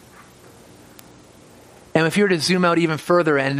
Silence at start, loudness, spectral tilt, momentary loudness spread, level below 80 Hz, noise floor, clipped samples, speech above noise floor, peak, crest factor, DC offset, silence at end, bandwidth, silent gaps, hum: 1.95 s; -18 LUFS; -5 dB/octave; 3 LU; -60 dBFS; -47 dBFS; under 0.1%; 29 dB; -2 dBFS; 20 dB; under 0.1%; 0 s; 15 kHz; none; none